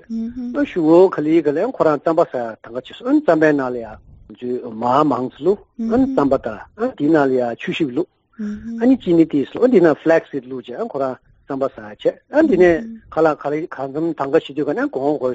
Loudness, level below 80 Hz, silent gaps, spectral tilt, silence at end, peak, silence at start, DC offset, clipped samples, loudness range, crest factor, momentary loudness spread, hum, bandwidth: -18 LUFS; -50 dBFS; none; -6 dB/octave; 0 s; -2 dBFS; 0.1 s; under 0.1%; under 0.1%; 2 LU; 16 dB; 14 LU; none; 7.8 kHz